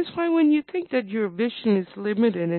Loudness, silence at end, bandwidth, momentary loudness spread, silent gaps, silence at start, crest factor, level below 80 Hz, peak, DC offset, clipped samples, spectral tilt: -23 LUFS; 0 s; 4.4 kHz; 6 LU; none; 0 s; 12 dB; -70 dBFS; -10 dBFS; under 0.1%; under 0.1%; -11.5 dB/octave